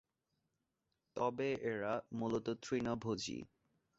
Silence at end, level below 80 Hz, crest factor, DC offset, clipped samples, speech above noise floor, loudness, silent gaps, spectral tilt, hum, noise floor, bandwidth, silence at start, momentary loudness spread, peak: 0.5 s; -70 dBFS; 18 dB; under 0.1%; under 0.1%; 47 dB; -40 LUFS; none; -5 dB/octave; none; -87 dBFS; 8 kHz; 1.15 s; 9 LU; -24 dBFS